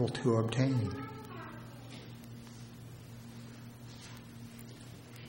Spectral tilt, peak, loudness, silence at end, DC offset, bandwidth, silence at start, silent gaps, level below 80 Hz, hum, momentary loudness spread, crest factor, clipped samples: -7 dB/octave; -16 dBFS; -35 LUFS; 0 s; under 0.1%; 16.5 kHz; 0 s; none; -64 dBFS; none; 19 LU; 22 dB; under 0.1%